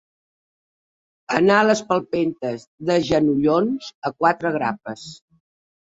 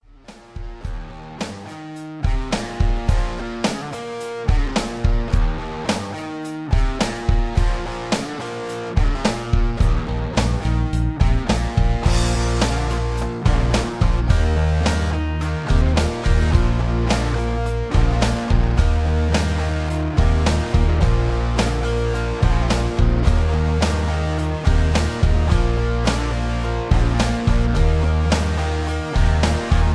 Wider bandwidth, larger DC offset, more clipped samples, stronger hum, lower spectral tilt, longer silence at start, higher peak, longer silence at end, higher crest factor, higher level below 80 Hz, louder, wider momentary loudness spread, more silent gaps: second, 8 kHz vs 11 kHz; neither; neither; neither; about the same, -5.5 dB/octave vs -6 dB/octave; first, 1.3 s vs 0.3 s; about the same, 0 dBFS vs 0 dBFS; first, 0.8 s vs 0 s; about the same, 22 dB vs 18 dB; second, -58 dBFS vs -20 dBFS; about the same, -20 LUFS vs -21 LUFS; first, 13 LU vs 9 LU; first, 2.67-2.78 s, 3.95-4.02 s vs none